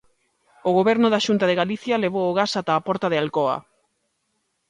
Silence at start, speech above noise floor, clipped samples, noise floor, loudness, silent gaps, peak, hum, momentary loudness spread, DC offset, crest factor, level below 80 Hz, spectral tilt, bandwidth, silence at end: 0.65 s; 52 dB; under 0.1%; -73 dBFS; -21 LUFS; none; -6 dBFS; none; 5 LU; under 0.1%; 16 dB; -64 dBFS; -5.5 dB/octave; 11 kHz; 1.1 s